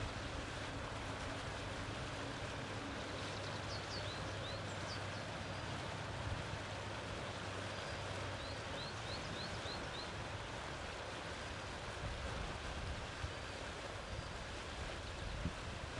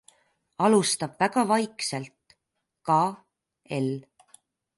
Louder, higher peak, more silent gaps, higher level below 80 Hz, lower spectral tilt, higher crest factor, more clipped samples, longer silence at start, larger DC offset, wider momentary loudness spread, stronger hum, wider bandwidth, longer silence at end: second, -45 LUFS vs -25 LUFS; second, -28 dBFS vs -8 dBFS; neither; first, -54 dBFS vs -74 dBFS; about the same, -4 dB/octave vs -4.5 dB/octave; about the same, 16 dB vs 20 dB; neither; second, 0 s vs 0.6 s; neither; second, 2 LU vs 16 LU; neither; about the same, 11.5 kHz vs 11.5 kHz; second, 0 s vs 0.75 s